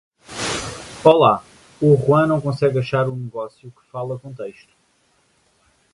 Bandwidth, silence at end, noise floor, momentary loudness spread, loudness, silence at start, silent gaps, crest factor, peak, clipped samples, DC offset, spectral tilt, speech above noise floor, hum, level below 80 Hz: 11.5 kHz; 1.4 s; -62 dBFS; 19 LU; -18 LUFS; 0.3 s; none; 20 dB; 0 dBFS; under 0.1%; under 0.1%; -6 dB/octave; 44 dB; none; -52 dBFS